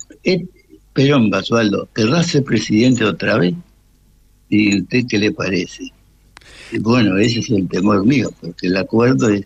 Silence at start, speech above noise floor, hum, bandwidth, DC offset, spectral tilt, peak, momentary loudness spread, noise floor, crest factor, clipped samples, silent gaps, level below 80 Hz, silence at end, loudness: 0.25 s; 36 dB; none; 9 kHz; under 0.1%; -6 dB/octave; -4 dBFS; 10 LU; -52 dBFS; 12 dB; under 0.1%; none; -50 dBFS; 0 s; -16 LUFS